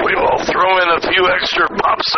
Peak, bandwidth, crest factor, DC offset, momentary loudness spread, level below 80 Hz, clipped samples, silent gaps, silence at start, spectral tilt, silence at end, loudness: -2 dBFS; 6.6 kHz; 12 dB; under 0.1%; 3 LU; -42 dBFS; under 0.1%; none; 0 s; 0 dB/octave; 0 s; -13 LUFS